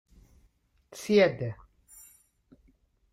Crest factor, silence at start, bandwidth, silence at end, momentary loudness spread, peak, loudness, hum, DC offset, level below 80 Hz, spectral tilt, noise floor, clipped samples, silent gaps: 22 dB; 0.95 s; 15.5 kHz; 1.6 s; 28 LU; -10 dBFS; -26 LUFS; none; under 0.1%; -62 dBFS; -5.5 dB/octave; -67 dBFS; under 0.1%; none